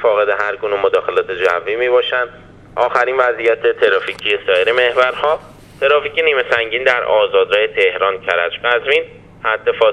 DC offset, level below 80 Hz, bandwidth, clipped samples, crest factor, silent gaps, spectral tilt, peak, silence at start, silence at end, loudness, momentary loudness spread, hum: under 0.1%; -52 dBFS; 9.4 kHz; under 0.1%; 16 dB; none; -4 dB/octave; 0 dBFS; 0 s; 0 s; -15 LUFS; 5 LU; none